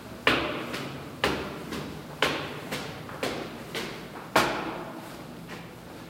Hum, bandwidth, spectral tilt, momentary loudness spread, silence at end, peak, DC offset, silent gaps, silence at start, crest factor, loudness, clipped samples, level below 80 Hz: none; 16 kHz; -3.5 dB/octave; 16 LU; 0 s; -6 dBFS; under 0.1%; none; 0 s; 26 dB; -31 LUFS; under 0.1%; -54 dBFS